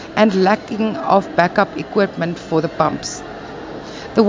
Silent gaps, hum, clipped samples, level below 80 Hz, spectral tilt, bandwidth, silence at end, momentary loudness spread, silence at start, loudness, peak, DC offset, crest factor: none; none; under 0.1%; -50 dBFS; -5.5 dB/octave; 7.6 kHz; 0 s; 16 LU; 0 s; -18 LUFS; 0 dBFS; under 0.1%; 18 dB